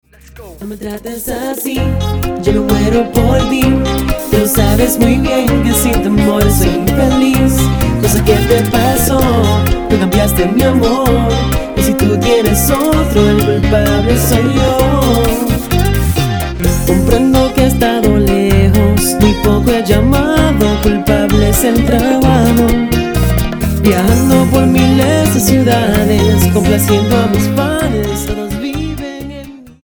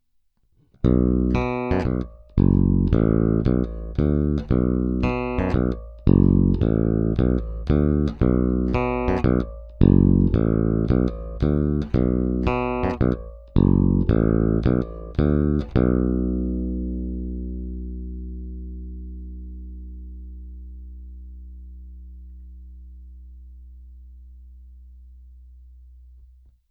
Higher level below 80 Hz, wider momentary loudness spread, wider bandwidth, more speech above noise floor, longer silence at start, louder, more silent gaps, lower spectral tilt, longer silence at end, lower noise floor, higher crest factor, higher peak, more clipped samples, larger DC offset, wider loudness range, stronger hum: first, -20 dBFS vs -30 dBFS; second, 6 LU vs 21 LU; first, over 20 kHz vs 6.2 kHz; second, 24 dB vs 46 dB; second, 0.35 s vs 0.85 s; first, -11 LUFS vs -22 LUFS; neither; second, -5.5 dB/octave vs -10.5 dB/octave; second, 0.15 s vs 1.2 s; second, -34 dBFS vs -64 dBFS; second, 10 dB vs 22 dB; about the same, 0 dBFS vs 0 dBFS; neither; neither; second, 2 LU vs 18 LU; neither